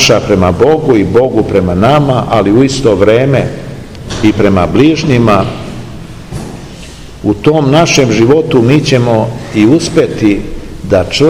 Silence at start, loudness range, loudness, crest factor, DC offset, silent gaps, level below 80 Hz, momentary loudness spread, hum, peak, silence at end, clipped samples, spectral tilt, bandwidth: 0 s; 3 LU; -9 LUFS; 10 dB; 1%; none; -30 dBFS; 17 LU; none; 0 dBFS; 0 s; 3%; -6 dB/octave; 16 kHz